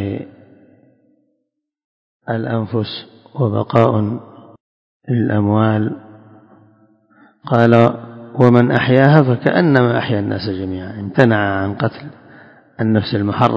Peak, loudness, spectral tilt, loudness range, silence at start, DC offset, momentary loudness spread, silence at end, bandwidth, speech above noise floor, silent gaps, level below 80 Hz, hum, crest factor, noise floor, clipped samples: 0 dBFS; -16 LUFS; -9 dB/octave; 8 LU; 0 s; under 0.1%; 18 LU; 0 s; 7 kHz; 58 dB; 1.84-2.20 s, 4.60-5.00 s; -48 dBFS; none; 16 dB; -73 dBFS; 0.2%